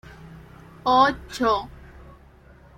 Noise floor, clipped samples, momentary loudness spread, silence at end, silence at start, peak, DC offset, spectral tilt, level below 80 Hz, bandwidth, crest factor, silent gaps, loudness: -50 dBFS; under 0.1%; 26 LU; 1.1 s; 0.1 s; -4 dBFS; under 0.1%; -4.5 dB/octave; -48 dBFS; 16 kHz; 22 dB; none; -22 LUFS